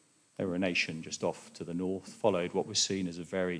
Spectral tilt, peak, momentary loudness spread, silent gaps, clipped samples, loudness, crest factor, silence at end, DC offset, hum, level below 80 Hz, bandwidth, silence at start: -3.5 dB/octave; -12 dBFS; 9 LU; none; under 0.1%; -33 LUFS; 20 dB; 0 s; under 0.1%; none; -72 dBFS; 10.5 kHz; 0.4 s